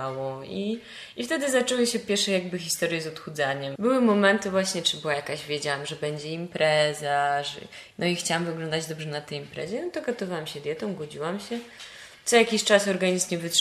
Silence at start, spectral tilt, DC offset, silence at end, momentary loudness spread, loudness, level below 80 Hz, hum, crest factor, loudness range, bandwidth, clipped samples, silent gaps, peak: 0 s; -3.5 dB/octave; under 0.1%; 0 s; 13 LU; -26 LUFS; -68 dBFS; none; 20 dB; 6 LU; 14.5 kHz; under 0.1%; none; -6 dBFS